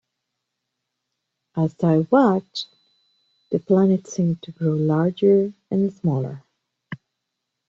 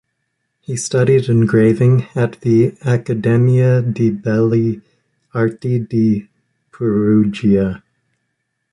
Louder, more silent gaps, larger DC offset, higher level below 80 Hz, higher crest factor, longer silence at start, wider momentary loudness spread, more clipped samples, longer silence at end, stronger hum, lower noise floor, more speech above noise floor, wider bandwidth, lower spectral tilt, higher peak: second, -21 LUFS vs -15 LUFS; neither; neither; second, -64 dBFS vs -48 dBFS; first, 18 dB vs 12 dB; first, 1.55 s vs 0.7 s; first, 20 LU vs 10 LU; neither; second, 0.75 s vs 0.95 s; neither; first, -80 dBFS vs -72 dBFS; about the same, 60 dB vs 57 dB; second, 7.6 kHz vs 11.5 kHz; about the same, -8 dB/octave vs -8 dB/octave; second, -6 dBFS vs -2 dBFS